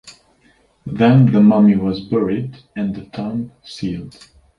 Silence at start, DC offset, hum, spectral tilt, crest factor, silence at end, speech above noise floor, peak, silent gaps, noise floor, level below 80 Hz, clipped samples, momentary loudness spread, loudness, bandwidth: 0.05 s; under 0.1%; none; -9 dB/octave; 16 dB; 0.5 s; 40 dB; -2 dBFS; none; -56 dBFS; -48 dBFS; under 0.1%; 19 LU; -16 LUFS; 7.4 kHz